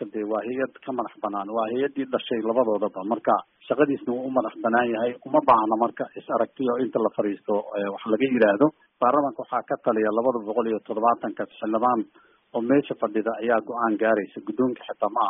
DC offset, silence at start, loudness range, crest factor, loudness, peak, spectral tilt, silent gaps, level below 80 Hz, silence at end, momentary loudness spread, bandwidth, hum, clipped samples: under 0.1%; 0 s; 2 LU; 18 dB; -25 LUFS; -6 dBFS; -1.5 dB/octave; none; -68 dBFS; 0 s; 9 LU; 3.9 kHz; none; under 0.1%